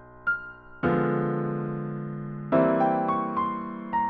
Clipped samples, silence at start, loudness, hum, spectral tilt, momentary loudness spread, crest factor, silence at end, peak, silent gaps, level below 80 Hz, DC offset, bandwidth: under 0.1%; 0 s; -27 LUFS; none; -7.5 dB/octave; 11 LU; 16 dB; 0 s; -10 dBFS; none; -58 dBFS; under 0.1%; 4.8 kHz